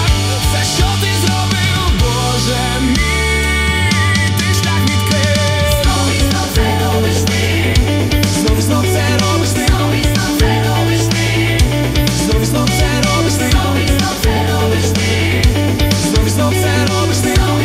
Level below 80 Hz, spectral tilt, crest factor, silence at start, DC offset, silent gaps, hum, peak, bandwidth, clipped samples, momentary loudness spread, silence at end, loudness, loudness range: -22 dBFS; -4.5 dB/octave; 12 dB; 0 s; under 0.1%; none; none; 0 dBFS; 16 kHz; under 0.1%; 1 LU; 0 s; -13 LUFS; 0 LU